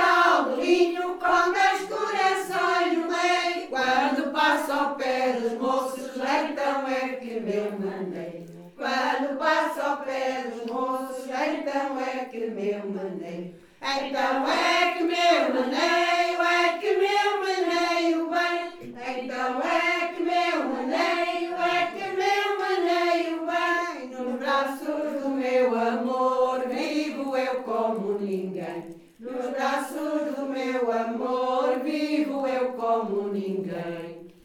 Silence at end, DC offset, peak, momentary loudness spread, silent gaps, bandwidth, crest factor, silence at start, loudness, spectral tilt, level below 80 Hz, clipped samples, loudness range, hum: 0.15 s; under 0.1%; -8 dBFS; 10 LU; none; 17.5 kHz; 18 dB; 0 s; -25 LUFS; -4 dB/octave; -70 dBFS; under 0.1%; 6 LU; none